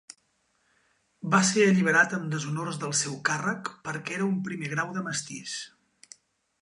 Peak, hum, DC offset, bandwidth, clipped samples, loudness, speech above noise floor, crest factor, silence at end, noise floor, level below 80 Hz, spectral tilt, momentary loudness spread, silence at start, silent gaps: -8 dBFS; none; under 0.1%; 11 kHz; under 0.1%; -27 LUFS; 45 dB; 20 dB; 0.95 s; -71 dBFS; -74 dBFS; -4 dB/octave; 14 LU; 1.25 s; none